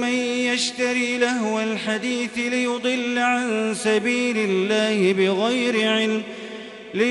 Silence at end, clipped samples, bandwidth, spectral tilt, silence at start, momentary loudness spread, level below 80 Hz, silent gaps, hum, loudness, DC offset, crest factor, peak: 0 s; under 0.1%; 11.5 kHz; -3.5 dB/octave; 0 s; 5 LU; -68 dBFS; none; none; -21 LUFS; under 0.1%; 14 dB; -6 dBFS